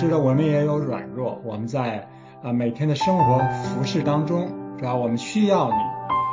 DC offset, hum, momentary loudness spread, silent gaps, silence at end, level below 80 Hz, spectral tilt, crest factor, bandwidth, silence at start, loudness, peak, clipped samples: under 0.1%; none; 10 LU; none; 0 s; -54 dBFS; -7 dB/octave; 16 dB; 7.6 kHz; 0 s; -23 LUFS; -6 dBFS; under 0.1%